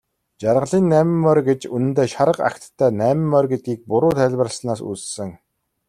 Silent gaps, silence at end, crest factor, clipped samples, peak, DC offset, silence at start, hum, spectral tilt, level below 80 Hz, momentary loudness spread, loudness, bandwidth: none; 0.55 s; 16 dB; under 0.1%; -2 dBFS; under 0.1%; 0.4 s; none; -6.5 dB/octave; -56 dBFS; 10 LU; -19 LUFS; 14 kHz